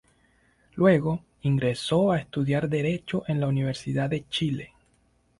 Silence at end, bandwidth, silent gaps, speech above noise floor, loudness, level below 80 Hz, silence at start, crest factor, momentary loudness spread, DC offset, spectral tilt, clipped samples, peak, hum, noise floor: 0.75 s; 11.5 kHz; none; 41 dB; -26 LUFS; -56 dBFS; 0.75 s; 18 dB; 8 LU; under 0.1%; -7 dB/octave; under 0.1%; -8 dBFS; none; -66 dBFS